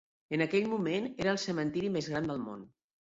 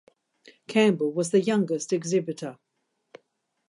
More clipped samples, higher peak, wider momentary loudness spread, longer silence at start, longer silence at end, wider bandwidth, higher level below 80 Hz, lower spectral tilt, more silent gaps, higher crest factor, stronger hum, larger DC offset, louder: neither; second, -16 dBFS vs -8 dBFS; second, 8 LU vs 12 LU; second, 0.3 s vs 0.45 s; second, 0.5 s vs 1.15 s; second, 8 kHz vs 11.5 kHz; first, -66 dBFS vs -78 dBFS; about the same, -5.5 dB/octave vs -5.5 dB/octave; neither; about the same, 18 dB vs 20 dB; neither; neither; second, -33 LUFS vs -25 LUFS